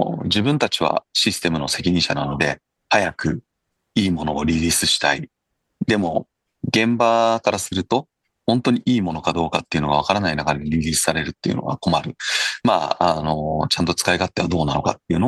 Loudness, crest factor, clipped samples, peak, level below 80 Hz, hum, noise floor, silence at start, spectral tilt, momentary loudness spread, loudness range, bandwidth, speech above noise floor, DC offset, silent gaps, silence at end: -20 LUFS; 18 dB; under 0.1%; -2 dBFS; -44 dBFS; none; -64 dBFS; 0 s; -4 dB/octave; 7 LU; 1 LU; 12.5 kHz; 44 dB; under 0.1%; none; 0 s